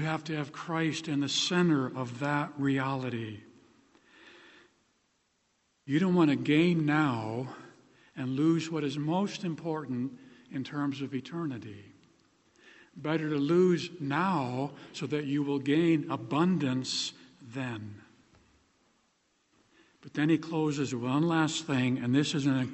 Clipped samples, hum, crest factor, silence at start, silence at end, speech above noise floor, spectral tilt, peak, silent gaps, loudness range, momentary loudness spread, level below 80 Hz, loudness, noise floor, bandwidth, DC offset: under 0.1%; none; 18 dB; 0 s; 0 s; 45 dB; -5.5 dB/octave; -12 dBFS; none; 8 LU; 14 LU; -72 dBFS; -30 LUFS; -74 dBFS; 8.4 kHz; under 0.1%